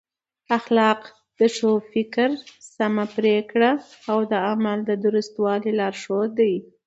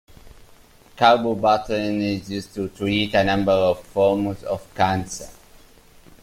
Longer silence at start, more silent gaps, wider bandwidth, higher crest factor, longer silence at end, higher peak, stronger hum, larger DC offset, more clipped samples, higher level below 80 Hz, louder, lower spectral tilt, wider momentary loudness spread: first, 0.5 s vs 0.25 s; neither; second, 8 kHz vs 16 kHz; about the same, 18 dB vs 20 dB; second, 0.25 s vs 0.9 s; about the same, -4 dBFS vs -2 dBFS; neither; neither; neither; second, -70 dBFS vs -48 dBFS; about the same, -22 LUFS vs -21 LUFS; about the same, -5.5 dB/octave vs -5.5 dB/octave; second, 6 LU vs 13 LU